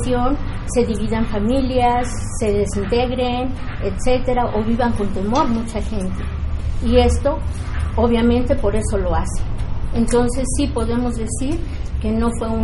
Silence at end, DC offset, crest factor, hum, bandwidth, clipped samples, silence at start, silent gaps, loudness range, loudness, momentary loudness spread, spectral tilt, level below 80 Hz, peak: 0 s; under 0.1%; 16 dB; none; 11.5 kHz; under 0.1%; 0 s; none; 2 LU; -20 LUFS; 8 LU; -6 dB/octave; -24 dBFS; -2 dBFS